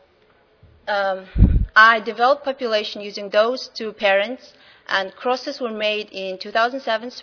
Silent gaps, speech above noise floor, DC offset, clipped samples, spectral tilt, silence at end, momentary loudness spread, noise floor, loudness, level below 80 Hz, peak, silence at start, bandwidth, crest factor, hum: none; 37 dB; under 0.1%; under 0.1%; -5.5 dB/octave; 0 s; 14 LU; -57 dBFS; -20 LUFS; -30 dBFS; 0 dBFS; 0.85 s; 5.4 kHz; 20 dB; none